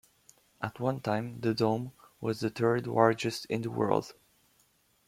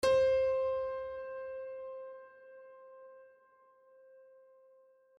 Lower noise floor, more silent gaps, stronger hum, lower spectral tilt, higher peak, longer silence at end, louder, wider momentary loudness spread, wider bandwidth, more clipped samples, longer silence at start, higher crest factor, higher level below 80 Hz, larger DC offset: first, -69 dBFS vs -65 dBFS; neither; neither; first, -6.5 dB/octave vs -3.5 dB/octave; first, -8 dBFS vs -18 dBFS; second, 0.95 s vs 1.95 s; first, -31 LUFS vs -34 LUFS; second, 12 LU vs 26 LU; first, 16 kHz vs 10.5 kHz; neither; first, 0.6 s vs 0 s; first, 24 dB vs 18 dB; about the same, -68 dBFS vs -64 dBFS; neither